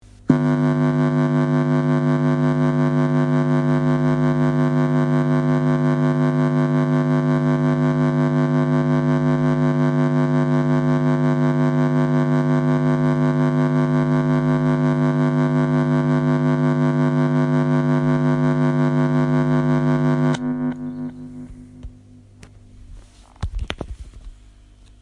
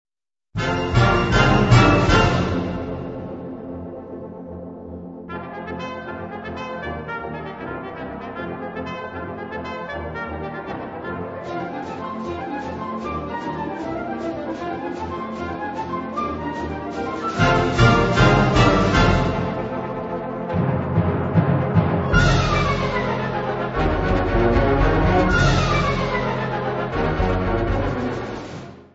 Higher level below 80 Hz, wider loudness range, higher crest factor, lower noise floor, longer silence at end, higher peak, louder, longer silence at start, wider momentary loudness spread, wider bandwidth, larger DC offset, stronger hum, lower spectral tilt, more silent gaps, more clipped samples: second, -44 dBFS vs -32 dBFS; second, 6 LU vs 13 LU; about the same, 18 dB vs 20 dB; about the same, -47 dBFS vs -46 dBFS; first, 0.7 s vs 0.1 s; about the same, 0 dBFS vs -2 dBFS; about the same, -19 LUFS vs -21 LUFS; second, 0.3 s vs 0.55 s; second, 1 LU vs 16 LU; about the same, 8.2 kHz vs 8 kHz; neither; neither; first, -9 dB/octave vs -6.5 dB/octave; neither; neither